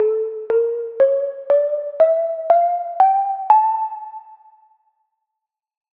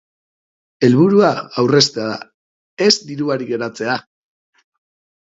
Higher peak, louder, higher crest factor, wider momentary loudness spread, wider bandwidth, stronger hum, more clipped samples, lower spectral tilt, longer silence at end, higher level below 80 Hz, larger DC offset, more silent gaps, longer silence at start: about the same, -2 dBFS vs 0 dBFS; about the same, -18 LUFS vs -16 LUFS; about the same, 18 dB vs 18 dB; second, 9 LU vs 12 LU; second, 4.2 kHz vs 7.8 kHz; neither; neither; about the same, -6 dB/octave vs -5 dB/octave; first, 1.65 s vs 1.2 s; second, -78 dBFS vs -62 dBFS; neither; second, none vs 2.34-2.77 s; second, 0 s vs 0.8 s